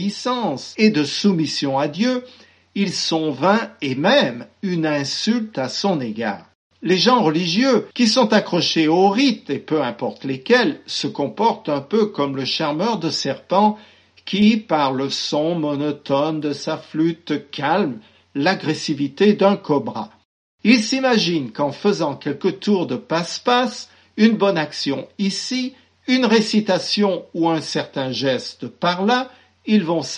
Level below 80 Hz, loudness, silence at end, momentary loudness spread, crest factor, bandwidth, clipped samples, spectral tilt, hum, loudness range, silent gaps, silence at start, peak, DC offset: -68 dBFS; -19 LUFS; 0 s; 10 LU; 18 dB; 9.8 kHz; under 0.1%; -5 dB/octave; none; 3 LU; 6.55-6.70 s, 20.25-20.58 s; 0 s; -2 dBFS; under 0.1%